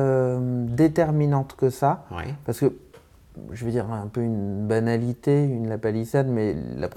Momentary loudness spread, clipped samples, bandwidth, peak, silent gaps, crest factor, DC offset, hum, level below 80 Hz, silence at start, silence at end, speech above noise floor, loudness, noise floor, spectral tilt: 9 LU; under 0.1%; 14.5 kHz; -8 dBFS; none; 16 dB; under 0.1%; none; -52 dBFS; 0 s; 0 s; 27 dB; -24 LUFS; -51 dBFS; -8.5 dB/octave